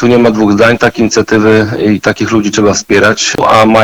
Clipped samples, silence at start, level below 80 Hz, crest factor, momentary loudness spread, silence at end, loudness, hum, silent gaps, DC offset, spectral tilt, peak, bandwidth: under 0.1%; 0 s; -38 dBFS; 8 dB; 4 LU; 0 s; -8 LUFS; none; none; under 0.1%; -4.5 dB/octave; 0 dBFS; 19.5 kHz